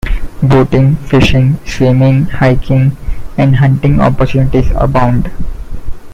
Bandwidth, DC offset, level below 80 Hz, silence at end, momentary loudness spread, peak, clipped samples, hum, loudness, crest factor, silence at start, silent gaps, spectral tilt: 7.6 kHz; under 0.1%; -18 dBFS; 0 s; 14 LU; 0 dBFS; under 0.1%; none; -10 LUFS; 10 dB; 0.05 s; none; -8 dB/octave